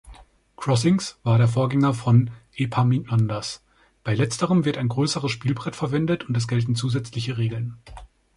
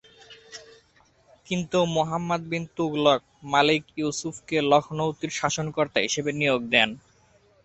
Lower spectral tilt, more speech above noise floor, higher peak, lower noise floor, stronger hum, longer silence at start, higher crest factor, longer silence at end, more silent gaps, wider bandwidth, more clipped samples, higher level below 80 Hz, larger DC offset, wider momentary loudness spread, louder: first, -6.5 dB/octave vs -4 dB/octave; second, 26 dB vs 36 dB; about the same, -6 dBFS vs -4 dBFS; second, -48 dBFS vs -61 dBFS; neither; second, 0.05 s vs 0.3 s; second, 16 dB vs 22 dB; second, 0.3 s vs 0.7 s; neither; first, 11.5 kHz vs 8.4 kHz; neither; first, -52 dBFS vs -62 dBFS; neither; about the same, 11 LU vs 10 LU; about the same, -23 LUFS vs -24 LUFS